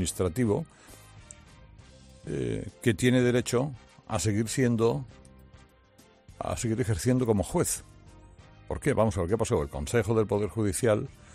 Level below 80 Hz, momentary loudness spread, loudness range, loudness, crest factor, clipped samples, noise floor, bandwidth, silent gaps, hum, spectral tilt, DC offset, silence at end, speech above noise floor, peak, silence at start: -50 dBFS; 12 LU; 3 LU; -28 LUFS; 18 dB; under 0.1%; -59 dBFS; 14 kHz; none; none; -5.5 dB/octave; under 0.1%; 0.2 s; 31 dB; -10 dBFS; 0 s